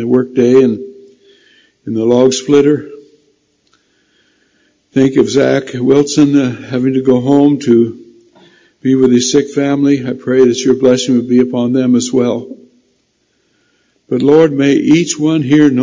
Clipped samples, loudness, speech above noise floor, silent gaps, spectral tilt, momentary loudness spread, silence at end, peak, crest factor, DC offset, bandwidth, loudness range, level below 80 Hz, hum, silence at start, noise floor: under 0.1%; -11 LUFS; 50 dB; none; -5.5 dB/octave; 9 LU; 0 s; 0 dBFS; 12 dB; under 0.1%; 7.6 kHz; 4 LU; -54 dBFS; none; 0 s; -60 dBFS